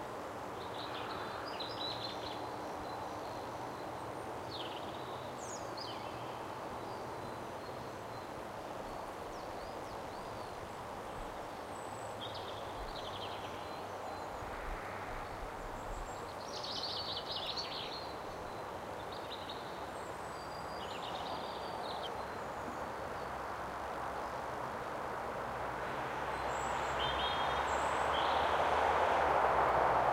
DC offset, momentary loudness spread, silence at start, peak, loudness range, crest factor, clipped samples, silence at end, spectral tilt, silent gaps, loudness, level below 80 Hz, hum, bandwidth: under 0.1%; 12 LU; 0 s; -18 dBFS; 10 LU; 22 dB; under 0.1%; 0 s; -4 dB/octave; none; -39 LUFS; -56 dBFS; none; 16 kHz